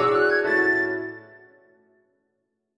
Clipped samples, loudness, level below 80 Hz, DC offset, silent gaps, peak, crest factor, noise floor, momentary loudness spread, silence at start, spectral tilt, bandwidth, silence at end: under 0.1%; -21 LUFS; -64 dBFS; under 0.1%; none; -10 dBFS; 16 dB; -77 dBFS; 16 LU; 0 s; -6 dB/octave; 9.4 kHz; 1.55 s